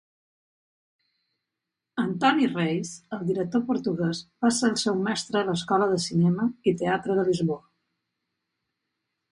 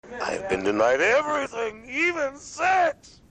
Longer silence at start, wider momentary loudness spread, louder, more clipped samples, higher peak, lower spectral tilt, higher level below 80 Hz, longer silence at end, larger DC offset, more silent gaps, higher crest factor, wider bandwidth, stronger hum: first, 1.95 s vs 0.05 s; second, 7 LU vs 10 LU; about the same, -25 LUFS vs -24 LUFS; neither; about the same, -8 dBFS vs -10 dBFS; first, -5.5 dB/octave vs -3.5 dB/octave; second, -66 dBFS vs -56 dBFS; first, 1.75 s vs 0.4 s; neither; neither; about the same, 18 dB vs 14 dB; first, 11.5 kHz vs 9.4 kHz; neither